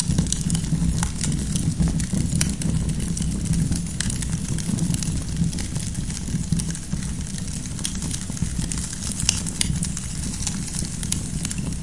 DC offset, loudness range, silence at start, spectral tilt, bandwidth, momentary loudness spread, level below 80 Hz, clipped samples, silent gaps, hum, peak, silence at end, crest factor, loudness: 1%; 3 LU; 0 s; -4 dB/octave; 11.5 kHz; 5 LU; -32 dBFS; under 0.1%; none; none; 0 dBFS; 0 s; 24 dB; -25 LUFS